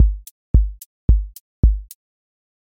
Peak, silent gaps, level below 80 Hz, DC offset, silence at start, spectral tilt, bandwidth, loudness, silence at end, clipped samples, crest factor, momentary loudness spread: -2 dBFS; 0.31-0.54 s, 0.86-1.08 s, 1.40-1.63 s; -20 dBFS; under 0.1%; 0 s; -8.5 dB/octave; 16.5 kHz; -21 LUFS; 0.85 s; under 0.1%; 16 dB; 11 LU